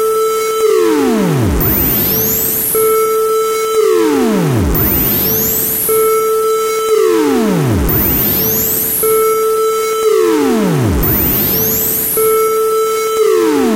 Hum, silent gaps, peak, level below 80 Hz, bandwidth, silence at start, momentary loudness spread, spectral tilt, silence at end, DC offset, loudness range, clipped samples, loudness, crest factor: none; none; -2 dBFS; -28 dBFS; 16 kHz; 0 s; 3 LU; -4.5 dB/octave; 0 s; under 0.1%; 0 LU; under 0.1%; -11 LUFS; 10 dB